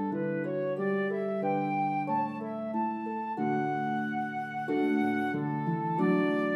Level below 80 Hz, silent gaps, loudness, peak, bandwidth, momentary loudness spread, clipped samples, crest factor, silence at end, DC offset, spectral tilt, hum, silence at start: -84 dBFS; none; -31 LUFS; -16 dBFS; 12 kHz; 7 LU; under 0.1%; 14 dB; 0 s; under 0.1%; -8.5 dB/octave; none; 0 s